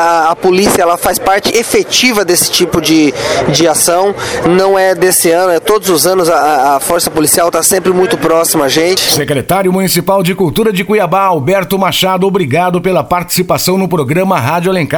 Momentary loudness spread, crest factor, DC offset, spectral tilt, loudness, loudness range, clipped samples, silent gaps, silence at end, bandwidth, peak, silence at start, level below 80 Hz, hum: 4 LU; 10 dB; 0.3%; -3.5 dB/octave; -9 LUFS; 2 LU; under 0.1%; none; 0 s; over 20 kHz; 0 dBFS; 0 s; -40 dBFS; none